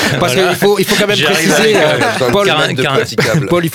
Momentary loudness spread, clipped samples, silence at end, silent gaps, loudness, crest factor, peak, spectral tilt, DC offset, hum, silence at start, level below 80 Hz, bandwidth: 3 LU; under 0.1%; 0 s; none; -11 LUFS; 12 dB; 0 dBFS; -4 dB/octave; 0.2%; none; 0 s; -44 dBFS; 18.5 kHz